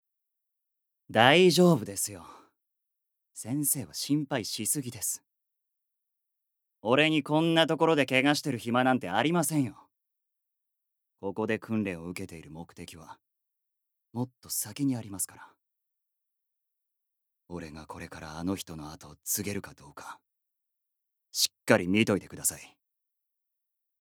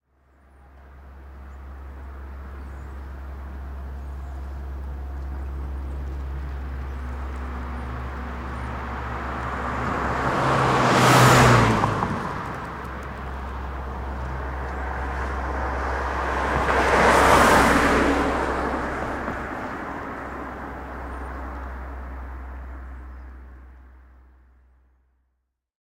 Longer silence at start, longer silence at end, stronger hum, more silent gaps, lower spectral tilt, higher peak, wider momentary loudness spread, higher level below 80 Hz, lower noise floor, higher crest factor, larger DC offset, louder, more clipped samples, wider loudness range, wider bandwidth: first, 1.1 s vs 0.6 s; second, 1.35 s vs 1.9 s; neither; neither; about the same, -4 dB/octave vs -5 dB/octave; about the same, -4 dBFS vs -4 dBFS; about the same, 21 LU vs 22 LU; second, -68 dBFS vs -34 dBFS; first, -84 dBFS vs -75 dBFS; first, 28 dB vs 20 dB; neither; second, -27 LUFS vs -23 LUFS; neither; second, 12 LU vs 19 LU; first, over 20 kHz vs 16 kHz